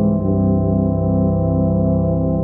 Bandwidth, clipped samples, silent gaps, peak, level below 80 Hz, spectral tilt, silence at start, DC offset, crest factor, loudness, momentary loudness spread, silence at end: 1.6 kHz; under 0.1%; none; -6 dBFS; -30 dBFS; -15.5 dB/octave; 0 s; under 0.1%; 10 dB; -17 LUFS; 1 LU; 0 s